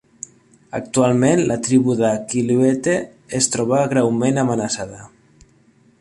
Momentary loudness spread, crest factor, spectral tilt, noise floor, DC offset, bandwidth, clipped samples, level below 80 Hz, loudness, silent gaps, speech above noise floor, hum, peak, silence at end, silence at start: 14 LU; 16 dB; -5 dB/octave; -54 dBFS; under 0.1%; 11.5 kHz; under 0.1%; -54 dBFS; -18 LUFS; none; 37 dB; none; -4 dBFS; 0.95 s; 0.75 s